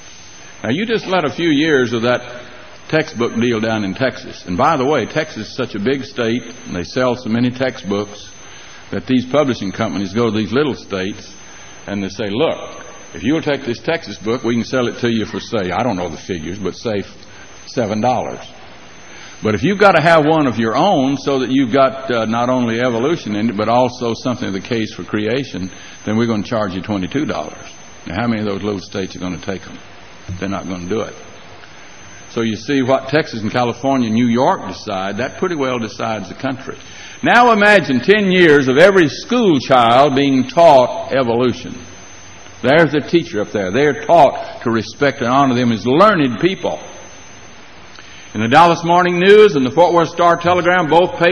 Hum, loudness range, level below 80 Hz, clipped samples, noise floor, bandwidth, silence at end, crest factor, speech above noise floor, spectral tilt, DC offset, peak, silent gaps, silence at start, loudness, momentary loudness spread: none; 10 LU; -48 dBFS; under 0.1%; -39 dBFS; 10.5 kHz; 0 s; 16 dB; 24 dB; -5.5 dB/octave; 0.8%; 0 dBFS; none; 0 s; -15 LUFS; 18 LU